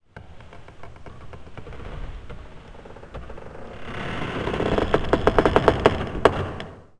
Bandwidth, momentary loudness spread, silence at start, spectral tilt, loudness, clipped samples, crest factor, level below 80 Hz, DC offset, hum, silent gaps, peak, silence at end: 11 kHz; 25 LU; 0.15 s; -6.5 dB/octave; -22 LUFS; under 0.1%; 26 dB; -36 dBFS; under 0.1%; none; none; 0 dBFS; 0.15 s